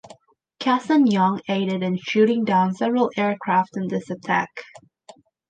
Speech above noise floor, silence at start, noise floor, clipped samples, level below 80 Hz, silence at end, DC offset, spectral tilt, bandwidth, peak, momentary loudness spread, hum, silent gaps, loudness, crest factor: 30 dB; 0.6 s; -50 dBFS; under 0.1%; -70 dBFS; 0.85 s; under 0.1%; -6.5 dB/octave; 9 kHz; -6 dBFS; 9 LU; none; none; -21 LUFS; 16 dB